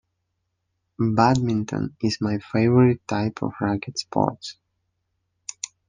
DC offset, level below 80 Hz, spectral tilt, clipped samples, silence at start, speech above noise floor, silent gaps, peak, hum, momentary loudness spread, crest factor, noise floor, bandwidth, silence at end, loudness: under 0.1%; -58 dBFS; -6.5 dB/octave; under 0.1%; 1 s; 55 dB; none; -2 dBFS; none; 15 LU; 22 dB; -76 dBFS; 9.8 kHz; 1.35 s; -23 LUFS